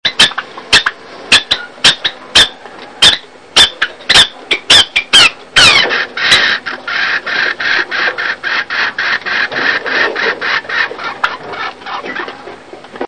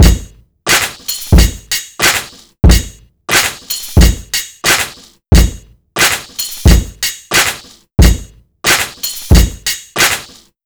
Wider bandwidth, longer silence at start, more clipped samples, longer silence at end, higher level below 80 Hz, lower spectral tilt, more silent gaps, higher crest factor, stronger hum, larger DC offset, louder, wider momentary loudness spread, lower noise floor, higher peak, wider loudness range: second, 11 kHz vs over 20 kHz; about the same, 0.05 s vs 0 s; about the same, 1% vs 2%; second, 0 s vs 0.4 s; second, -42 dBFS vs -16 dBFS; second, 0 dB/octave vs -3.5 dB/octave; neither; about the same, 12 dB vs 12 dB; neither; first, 0.5% vs under 0.1%; first, -9 LUFS vs -12 LUFS; first, 13 LU vs 10 LU; about the same, -32 dBFS vs -32 dBFS; about the same, 0 dBFS vs 0 dBFS; first, 7 LU vs 1 LU